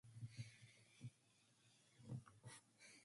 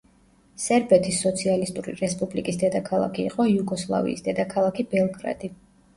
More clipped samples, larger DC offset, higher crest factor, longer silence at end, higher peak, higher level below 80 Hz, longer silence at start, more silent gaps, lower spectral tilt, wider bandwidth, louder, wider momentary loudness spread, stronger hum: neither; neither; about the same, 20 dB vs 20 dB; second, 0 s vs 0.4 s; second, -42 dBFS vs -6 dBFS; second, -84 dBFS vs -56 dBFS; second, 0.05 s vs 0.6 s; neither; about the same, -5 dB/octave vs -5 dB/octave; about the same, 11.5 kHz vs 11.5 kHz; second, -60 LUFS vs -24 LUFS; about the same, 10 LU vs 10 LU; neither